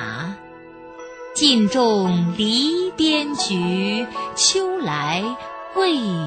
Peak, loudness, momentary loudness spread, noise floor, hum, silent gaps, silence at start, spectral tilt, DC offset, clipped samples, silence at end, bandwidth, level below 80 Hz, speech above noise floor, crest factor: -2 dBFS; -19 LUFS; 15 LU; -40 dBFS; none; none; 0 s; -3.5 dB/octave; under 0.1%; under 0.1%; 0 s; 9.2 kHz; -58 dBFS; 21 dB; 18 dB